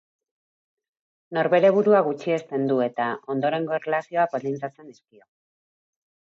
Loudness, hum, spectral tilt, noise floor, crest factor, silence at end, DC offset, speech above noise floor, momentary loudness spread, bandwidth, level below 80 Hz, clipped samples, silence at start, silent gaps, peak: -23 LUFS; none; -7.5 dB/octave; under -90 dBFS; 18 dB; 1.4 s; under 0.1%; over 67 dB; 11 LU; 7.4 kHz; -80 dBFS; under 0.1%; 1.3 s; none; -6 dBFS